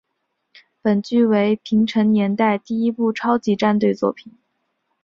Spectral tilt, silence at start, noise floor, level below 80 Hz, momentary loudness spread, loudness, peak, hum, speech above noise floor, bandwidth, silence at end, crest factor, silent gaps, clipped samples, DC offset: -7.5 dB/octave; 0.85 s; -74 dBFS; -62 dBFS; 6 LU; -19 LUFS; -4 dBFS; none; 56 dB; 7 kHz; 0.75 s; 16 dB; none; under 0.1%; under 0.1%